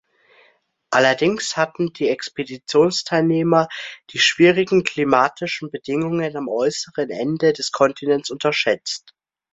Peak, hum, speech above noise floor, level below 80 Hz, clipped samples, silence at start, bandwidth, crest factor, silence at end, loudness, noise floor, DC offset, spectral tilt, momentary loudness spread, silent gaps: -2 dBFS; none; 40 dB; -62 dBFS; under 0.1%; 0.9 s; 8.2 kHz; 18 dB; 0.55 s; -19 LUFS; -60 dBFS; under 0.1%; -4.5 dB/octave; 10 LU; none